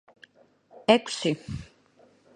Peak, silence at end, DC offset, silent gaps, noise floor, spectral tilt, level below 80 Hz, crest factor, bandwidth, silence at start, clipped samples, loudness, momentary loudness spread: -2 dBFS; 0.7 s; under 0.1%; none; -60 dBFS; -4.5 dB/octave; -56 dBFS; 26 dB; 11 kHz; 0.9 s; under 0.1%; -25 LUFS; 17 LU